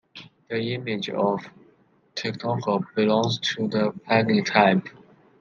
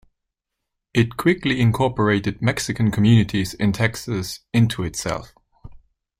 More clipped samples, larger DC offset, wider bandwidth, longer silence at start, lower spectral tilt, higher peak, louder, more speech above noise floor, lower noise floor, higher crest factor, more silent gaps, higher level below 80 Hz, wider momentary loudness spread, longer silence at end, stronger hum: neither; neither; second, 7.4 kHz vs 16 kHz; second, 0.15 s vs 0.95 s; about the same, -5.5 dB/octave vs -6 dB/octave; about the same, -2 dBFS vs -4 dBFS; second, -24 LUFS vs -21 LUFS; second, 37 dB vs 61 dB; second, -60 dBFS vs -81 dBFS; about the same, 22 dB vs 18 dB; neither; second, -68 dBFS vs -46 dBFS; about the same, 12 LU vs 10 LU; about the same, 0.5 s vs 0.45 s; neither